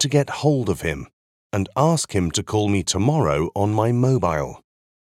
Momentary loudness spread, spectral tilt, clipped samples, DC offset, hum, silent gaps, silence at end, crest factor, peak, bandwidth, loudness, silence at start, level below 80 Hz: 8 LU; -5.5 dB/octave; under 0.1%; under 0.1%; none; 1.13-1.50 s; 0.55 s; 18 dB; -4 dBFS; 14.5 kHz; -21 LUFS; 0 s; -44 dBFS